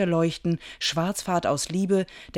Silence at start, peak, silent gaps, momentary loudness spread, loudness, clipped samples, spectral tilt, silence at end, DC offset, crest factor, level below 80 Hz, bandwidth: 0 s; -12 dBFS; none; 3 LU; -26 LUFS; under 0.1%; -5 dB/octave; 0 s; under 0.1%; 14 dB; -54 dBFS; 16.5 kHz